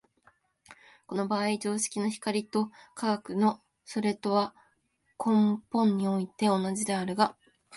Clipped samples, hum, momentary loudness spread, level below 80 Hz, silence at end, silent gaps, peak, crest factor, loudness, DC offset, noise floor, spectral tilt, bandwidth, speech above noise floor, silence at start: under 0.1%; none; 8 LU; -74 dBFS; 0 s; none; -10 dBFS; 20 dB; -29 LUFS; under 0.1%; -73 dBFS; -5 dB/octave; 12 kHz; 45 dB; 0.7 s